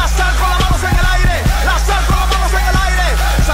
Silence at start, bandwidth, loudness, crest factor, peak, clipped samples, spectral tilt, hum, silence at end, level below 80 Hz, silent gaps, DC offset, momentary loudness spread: 0 s; 16.5 kHz; -14 LUFS; 8 dB; -4 dBFS; under 0.1%; -4 dB/octave; none; 0 s; -14 dBFS; none; under 0.1%; 1 LU